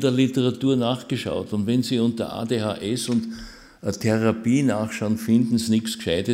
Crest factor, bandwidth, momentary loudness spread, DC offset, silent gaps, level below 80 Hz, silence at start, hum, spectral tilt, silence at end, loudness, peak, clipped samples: 16 dB; 16 kHz; 7 LU; under 0.1%; none; -54 dBFS; 0 s; none; -6 dB/octave; 0 s; -23 LUFS; -8 dBFS; under 0.1%